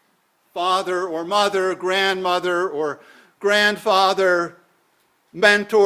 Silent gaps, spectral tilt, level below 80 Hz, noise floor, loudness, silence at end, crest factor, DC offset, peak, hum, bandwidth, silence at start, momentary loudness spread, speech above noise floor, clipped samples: none; -3 dB/octave; -68 dBFS; -64 dBFS; -19 LUFS; 0 s; 20 dB; under 0.1%; 0 dBFS; none; 15.5 kHz; 0.55 s; 10 LU; 45 dB; under 0.1%